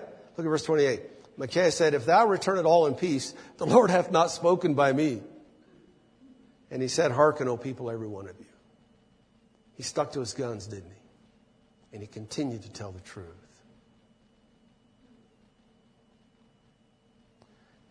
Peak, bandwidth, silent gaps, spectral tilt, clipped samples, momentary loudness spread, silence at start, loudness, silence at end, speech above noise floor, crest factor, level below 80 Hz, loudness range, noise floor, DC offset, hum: -6 dBFS; 10.5 kHz; none; -5 dB/octave; under 0.1%; 21 LU; 0 s; -26 LUFS; 4.6 s; 39 dB; 24 dB; -68 dBFS; 18 LU; -65 dBFS; under 0.1%; none